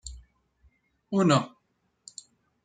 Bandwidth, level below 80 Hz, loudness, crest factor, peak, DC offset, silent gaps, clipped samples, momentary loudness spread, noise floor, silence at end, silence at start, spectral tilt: 9.4 kHz; -56 dBFS; -25 LUFS; 22 dB; -8 dBFS; under 0.1%; none; under 0.1%; 23 LU; -74 dBFS; 1.15 s; 0.05 s; -6 dB/octave